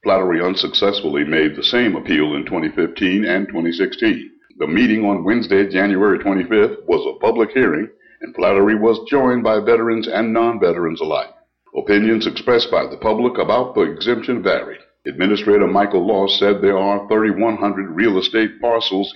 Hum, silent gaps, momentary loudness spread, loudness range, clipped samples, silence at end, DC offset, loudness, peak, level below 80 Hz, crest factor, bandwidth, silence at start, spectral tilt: none; none; 6 LU; 2 LU; under 0.1%; 0 s; 0.1%; -17 LUFS; -6 dBFS; -52 dBFS; 12 dB; 6.4 kHz; 0.05 s; -6.5 dB/octave